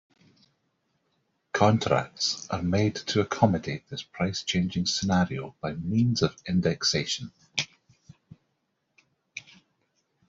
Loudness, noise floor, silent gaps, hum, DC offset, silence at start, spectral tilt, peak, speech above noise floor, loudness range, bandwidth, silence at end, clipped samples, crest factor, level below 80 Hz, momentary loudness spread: -27 LUFS; -77 dBFS; none; none; under 0.1%; 1.55 s; -5 dB/octave; -4 dBFS; 50 dB; 4 LU; 7.8 kHz; 0.9 s; under 0.1%; 24 dB; -60 dBFS; 11 LU